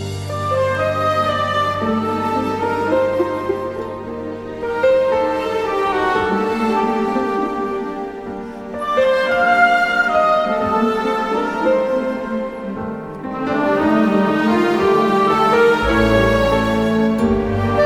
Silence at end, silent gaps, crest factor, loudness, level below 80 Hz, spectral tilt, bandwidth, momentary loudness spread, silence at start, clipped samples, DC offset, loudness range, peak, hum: 0 s; none; 16 dB; -17 LUFS; -38 dBFS; -6.5 dB/octave; 16 kHz; 12 LU; 0 s; under 0.1%; under 0.1%; 5 LU; -2 dBFS; none